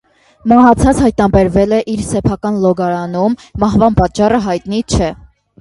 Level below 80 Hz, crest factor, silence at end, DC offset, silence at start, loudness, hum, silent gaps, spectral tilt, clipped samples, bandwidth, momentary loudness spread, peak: -28 dBFS; 12 dB; 0.45 s; under 0.1%; 0.45 s; -13 LUFS; none; none; -6.5 dB/octave; under 0.1%; 11.5 kHz; 8 LU; 0 dBFS